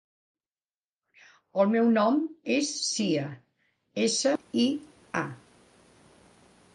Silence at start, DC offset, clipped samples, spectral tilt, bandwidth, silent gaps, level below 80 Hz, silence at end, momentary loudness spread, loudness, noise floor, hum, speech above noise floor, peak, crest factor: 1.55 s; under 0.1%; under 0.1%; -4 dB/octave; 11 kHz; none; -76 dBFS; 1.4 s; 13 LU; -27 LUFS; under -90 dBFS; none; over 64 dB; -10 dBFS; 18 dB